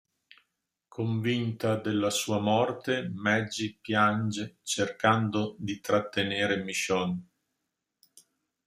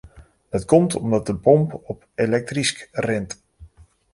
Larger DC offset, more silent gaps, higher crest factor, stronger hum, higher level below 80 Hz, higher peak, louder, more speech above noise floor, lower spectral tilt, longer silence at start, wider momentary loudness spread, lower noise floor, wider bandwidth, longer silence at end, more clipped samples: neither; neither; about the same, 22 dB vs 20 dB; neither; second, -68 dBFS vs -48 dBFS; second, -6 dBFS vs -2 dBFS; second, -29 LUFS vs -21 LUFS; first, 55 dB vs 29 dB; about the same, -4.5 dB/octave vs -5.5 dB/octave; first, 0.95 s vs 0.05 s; second, 9 LU vs 15 LU; first, -83 dBFS vs -49 dBFS; first, 15.5 kHz vs 11.5 kHz; first, 1.45 s vs 0.5 s; neither